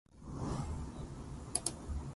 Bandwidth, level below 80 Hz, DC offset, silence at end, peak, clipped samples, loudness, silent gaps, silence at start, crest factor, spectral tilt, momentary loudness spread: 11.5 kHz; -48 dBFS; under 0.1%; 0 s; -16 dBFS; under 0.1%; -41 LUFS; none; 0.1 s; 26 dB; -4.5 dB/octave; 10 LU